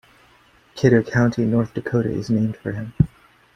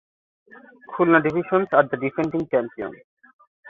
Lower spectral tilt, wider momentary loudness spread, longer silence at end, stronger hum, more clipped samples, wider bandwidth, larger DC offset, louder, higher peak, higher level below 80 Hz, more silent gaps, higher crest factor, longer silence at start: about the same, -8 dB/octave vs -8.5 dB/octave; second, 9 LU vs 16 LU; first, 0.5 s vs 0 s; neither; neither; first, 8.6 kHz vs 6.6 kHz; neither; about the same, -21 LUFS vs -21 LUFS; about the same, -2 dBFS vs -2 dBFS; first, -44 dBFS vs -62 dBFS; second, none vs 3.04-3.17 s, 3.34-3.39 s, 3.47-3.63 s; about the same, 20 dB vs 20 dB; second, 0.75 s vs 0.9 s